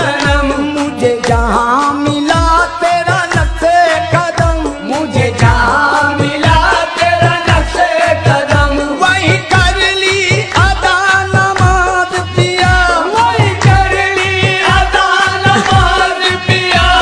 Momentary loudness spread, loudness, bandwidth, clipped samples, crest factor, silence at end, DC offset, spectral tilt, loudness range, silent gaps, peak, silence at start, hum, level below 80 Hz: 4 LU; -10 LUFS; 10.5 kHz; under 0.1%; 10 dB; 0 s; under 0.1%; -4.5 dB/octave; 2 LU; none; 0 dBFS; 0 s; none; -22 dBFS